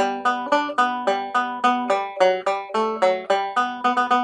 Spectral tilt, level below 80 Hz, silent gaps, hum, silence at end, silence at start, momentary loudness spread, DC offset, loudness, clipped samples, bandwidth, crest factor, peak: -3.5 dB/octave; -70 dBFS; none; none; 0 s; 0 s; 4 LU; under 0.1%; -21 LUFS; under 0.1%; 10 kHz; 16 dB; -4 dBFS